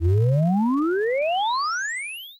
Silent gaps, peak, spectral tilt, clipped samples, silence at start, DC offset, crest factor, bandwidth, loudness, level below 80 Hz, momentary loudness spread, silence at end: none; -12 dBFS; -6 dB/octave; under 0.1%; 0 s; under 0.1%; 10 dB; 15 kHz; -22 LUFS; -44 dBFS; 6 LU; 0.05 s